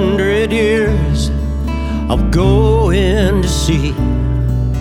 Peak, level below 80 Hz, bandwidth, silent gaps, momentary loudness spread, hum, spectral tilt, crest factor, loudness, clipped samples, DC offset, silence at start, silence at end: 0 dBFS; -18 dBFS; 14 kHz; none; 7 LU; none; -6.5 dB/octave; 12 dB; -14 LUFS; under 0.1%; under 0.1%; 0 s; 0 s